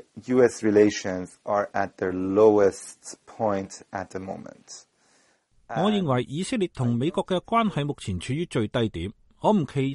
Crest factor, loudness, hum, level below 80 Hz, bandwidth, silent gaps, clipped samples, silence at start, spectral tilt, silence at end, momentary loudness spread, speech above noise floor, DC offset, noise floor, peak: 18 dB; -25 LUFS; none; -56 dBFS; 11.5 kHz; none; under 0.1%; 0.15 s; -6 dB/octave; 0 s; 17 LU; 39 dB; under 0.1%; -63 dBFS; -6 dBFS